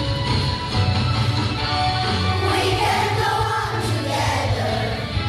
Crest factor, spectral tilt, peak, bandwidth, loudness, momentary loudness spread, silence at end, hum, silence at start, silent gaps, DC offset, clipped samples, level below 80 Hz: 12 dB; -5 dB/octave; -8 dBFS; 14 kHz; -21 LUFS; 3 LU; 0 s; none; 0 s; none; under 0.1%; under 0.1%; -34 dBFS